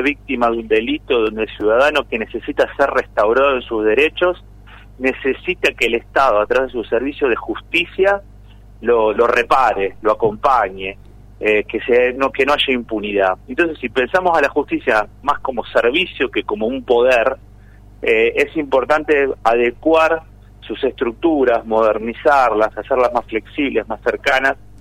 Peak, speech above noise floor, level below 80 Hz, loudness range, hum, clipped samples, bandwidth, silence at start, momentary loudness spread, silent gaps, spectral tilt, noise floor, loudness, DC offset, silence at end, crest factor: -2 dBFS; 25 dB; -42 dBFS; 1 LU; 50 Hz at -40 dBFS; under 0.1%; 15 kHz; 0 s; 7 LU; none; -5 dB/octave; -41 dBFS; -17 LUFS; under 0.1%; 0.25 s; 14 dB